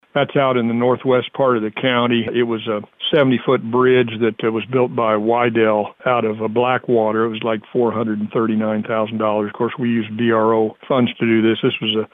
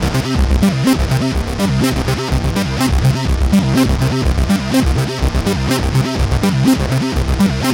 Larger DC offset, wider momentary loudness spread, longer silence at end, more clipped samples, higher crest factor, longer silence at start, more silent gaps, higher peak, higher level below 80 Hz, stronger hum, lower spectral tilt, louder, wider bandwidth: neither; about the same, 5 LU vs 4 LU; about the same, 0.05 s vs 0 s; neither; about the same, 12 dB vs 12 dB; first, 0.15 s vs 0 s; neither; about the same, -4 dBFS vs -2 dBFS; second, -64 dBFS vs -20 dBFS; neither; first, -9 dB/octave vs -6 dB/octave; second, -18 LUFS vs -15 LUFS; second, 3.9 kHz vs 17 kHz